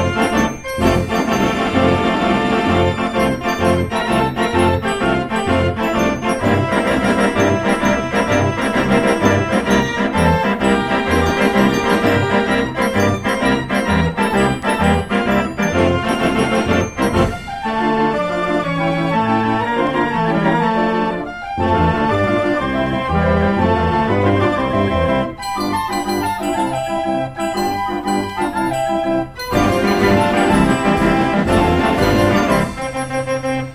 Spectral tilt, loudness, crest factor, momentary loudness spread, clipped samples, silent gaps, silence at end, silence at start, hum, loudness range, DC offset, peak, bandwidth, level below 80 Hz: -6 dB/octave; -16 LUFS; 16 dB; 5 LU; under 0.1%; none; 0 s; 0 s; none; 3 LU; 0.1%; 0 dBFS; 15.5 kHz; -34 dBFS